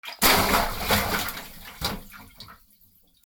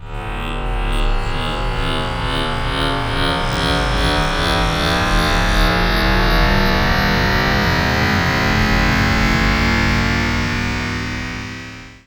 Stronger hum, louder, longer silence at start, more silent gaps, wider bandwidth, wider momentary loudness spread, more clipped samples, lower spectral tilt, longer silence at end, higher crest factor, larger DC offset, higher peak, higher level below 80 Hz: neither; second, -23 LUFS vs -17 LUFS; about the same, 0.05 s vs 0 s; neither; about the same, over 20 kHz vs over 20 kHz; first, 22 LU vs 8 LU; neither; second, -2.5 dB/octave vs -5 dB/octave; first, 0.75 s vs 0.1 s; first, 24 dB vs 14 dB; second, under 0.1% vs 0.4%; about the same, -4 dBFS vs -2 dBFS; second, -40 dBFS vs -22 dBFS